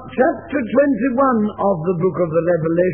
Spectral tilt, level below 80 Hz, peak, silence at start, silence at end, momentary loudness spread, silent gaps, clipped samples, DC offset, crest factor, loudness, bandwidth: -12.5 dB/octave; -52 dBFS; -4 dBFS; 0 s; 0 s; 3 LU; none; under 0.1%; 0.2%; 14 dB; -18 LUFS; 3.4 kHz